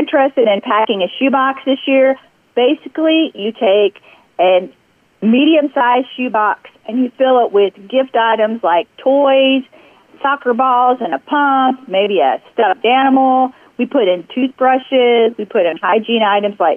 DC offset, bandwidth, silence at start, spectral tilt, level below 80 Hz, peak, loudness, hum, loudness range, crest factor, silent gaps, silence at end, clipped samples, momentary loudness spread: under 0.1%; 3.6 kHz; 0 s; -7 dB/octave; -68 dBFS; -4 dBFS; -14 LUFS; none; 1 LU; 10 dB; none; 0 s; under 0.1%; 7 LU